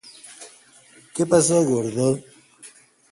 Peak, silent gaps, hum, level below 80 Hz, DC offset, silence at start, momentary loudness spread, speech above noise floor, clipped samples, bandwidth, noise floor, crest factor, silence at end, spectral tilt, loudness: -4 dBFS; none; none; -62 dBFS; under 0.1%; 0.05 s; 25 LU; 32 dB; under 0.1%; 11.5 kHz; -52 dBFS; 20 dB; 0.45 s; -5 dB/octave; -20 LUFS